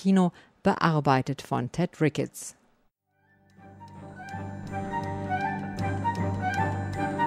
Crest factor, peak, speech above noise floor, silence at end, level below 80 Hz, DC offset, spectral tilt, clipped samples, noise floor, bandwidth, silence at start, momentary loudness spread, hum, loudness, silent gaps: 22 dB; -6 dBFS; 44 dB; 0 s; -56 dBFS; under 0.1%; -6.5 dB/octave; under 0.1%; -70 dBFS; 14 kHz; 0 s; 16 LU; none; -28 LUFS; none